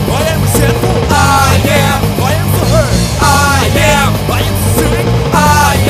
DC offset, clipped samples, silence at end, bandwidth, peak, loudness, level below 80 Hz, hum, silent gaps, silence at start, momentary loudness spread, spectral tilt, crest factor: under 0.1%; 0.1%; 0 s; 16 kHz; 0 dBFS; -10 LUFS; -20 dBFS; none; none; 0 s; 4 LU; -4.5 dB/octave; 10 dB